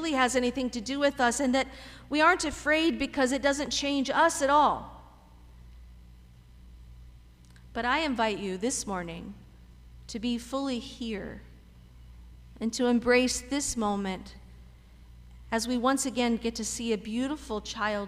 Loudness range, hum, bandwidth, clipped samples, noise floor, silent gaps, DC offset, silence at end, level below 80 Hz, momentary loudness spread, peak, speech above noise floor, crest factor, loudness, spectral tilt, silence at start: 10 LU; 60 Hz at -60 dBFS; 15.5 kHz; under 0.1%; -53 dBFS; none; under 0.1%; 0 s; -50 dBFS; 13 LU; -10 dBFS; 25 dB; 18 dB; -28 LUFS; -3 dB/octave; 0 s